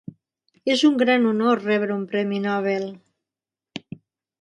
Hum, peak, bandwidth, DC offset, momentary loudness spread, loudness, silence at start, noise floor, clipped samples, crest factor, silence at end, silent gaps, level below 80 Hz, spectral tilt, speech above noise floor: none; -6 dBFS; 11.5 kHz; under 0.1%; 19 LU; -21 LUFS; 0.65 s; -89 dBFS; under 0.1%; 16 dB; 0.6 s; none; -70 dBFS; -5.5 dB/octave; 69 dB